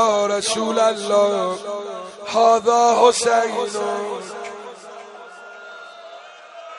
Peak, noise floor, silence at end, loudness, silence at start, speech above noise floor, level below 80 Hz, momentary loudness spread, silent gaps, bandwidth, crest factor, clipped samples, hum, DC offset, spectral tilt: -2 dBFS; -40 dBFS; 0 s; -18 LUFS; 0 s; 22 dB; -68 dBFS; 24 LU; none; 11.5 kHz; 18 dB; under 0.1%; none; under 0.1%; -2.5 dB/octave